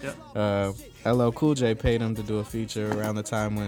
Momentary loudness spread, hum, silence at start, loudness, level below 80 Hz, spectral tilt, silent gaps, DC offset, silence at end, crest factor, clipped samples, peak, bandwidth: 8 LU; none; 0 s; -27 LUFS; -44 dBFS; -6.5 dB/octave; none; under 0.1%; 0 s; 16 dB; under 0.1%; -10 dBFS; 18.5 kHz